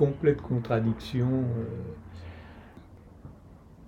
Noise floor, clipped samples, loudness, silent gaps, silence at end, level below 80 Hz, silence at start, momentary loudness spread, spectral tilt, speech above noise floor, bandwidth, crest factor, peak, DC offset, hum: -51 dBFS; under 0.1%; -29 LUFS; none; 0 s; -52 dBFS; 0 s; 23 LU; -9 dB/octave; 23 dB; 7.4 kHz; 20 dB; -10 dBFS; under 0.1%; none